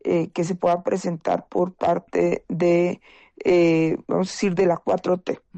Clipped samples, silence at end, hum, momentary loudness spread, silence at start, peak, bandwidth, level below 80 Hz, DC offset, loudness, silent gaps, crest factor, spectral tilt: under 0.1%; 0 s; none; 7 LU; 0.05 s; -10 dBFS; 8.6 kHz; -58 dBFS; under 0.1%; -22 LUFS; none; 12 dB; -6.5 dB/octave